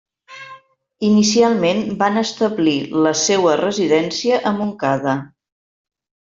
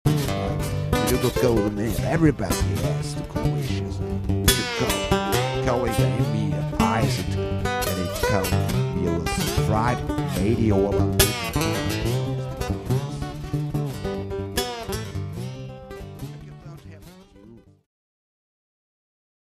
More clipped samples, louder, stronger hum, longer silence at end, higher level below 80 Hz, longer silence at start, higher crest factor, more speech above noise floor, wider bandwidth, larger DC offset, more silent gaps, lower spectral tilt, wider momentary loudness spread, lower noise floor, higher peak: neither; first, -17 LUFS vs -24 LUFS; neither; second, 1.05 s vs 1.85 s; second, -60 dBFS vs -36 dBFS; first, 0.3 s vs 0.05 s; second, 16 dB vs 24 dB; about the same, 28 dB vs 27 dB; second, 7.6 kHz vs 15.5 kHz; neither; neither; about the same, -4 dB/octave vs -5 dB/octave; second, 8 LU vs 12 LU; second, -44 dBFS vs -48 dBFS; about the same, -2 dBFS vs 0 dBFS